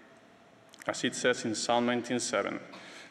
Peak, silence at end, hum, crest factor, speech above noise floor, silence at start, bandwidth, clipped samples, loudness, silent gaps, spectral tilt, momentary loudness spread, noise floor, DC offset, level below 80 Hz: -12 dBFS; 0 s; none; 20 dB; 27 dB; 0 s; 12.5 kHz; under 0.1%; -31 LUFS; none; -3 dB/octave; 13 LU; -58 dBFS; under 0.1%; -76 dBFS